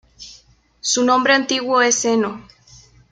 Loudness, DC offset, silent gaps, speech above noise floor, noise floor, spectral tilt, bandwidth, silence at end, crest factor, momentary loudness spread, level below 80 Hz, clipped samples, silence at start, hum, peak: -17 LUFS; under 0.1%; none; 34 dB; -51 dBFS; -1.5 dB/octave; 10 kHz; 0.7 s; 18 dB; 24 LU; -60 dBFS; under 0.1%; 0.2 s; none; -2 dBFS